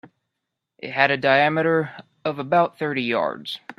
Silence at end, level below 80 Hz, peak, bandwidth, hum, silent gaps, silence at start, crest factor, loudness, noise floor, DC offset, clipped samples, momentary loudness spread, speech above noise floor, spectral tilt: 0.05 s; -68 dBFS; 0 dBFS; 12.5 kHz; none; none; 0.05 s; 22 dB; -21 LUFS; -81 dBFS; under 0.1%; under 0.1%; 13 LU; 60 dB; -6.5 dB/octave